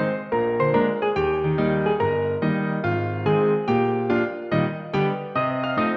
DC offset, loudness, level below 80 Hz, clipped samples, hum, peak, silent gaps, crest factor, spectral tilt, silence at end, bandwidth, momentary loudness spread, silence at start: under 0.1%; -23 LUFS; -50 dBFS; under 0.1%; none; -8 dBFS; none; 14 dB; -9 dB/octave; 0 s; 6 kHz; 4 LU; 0 s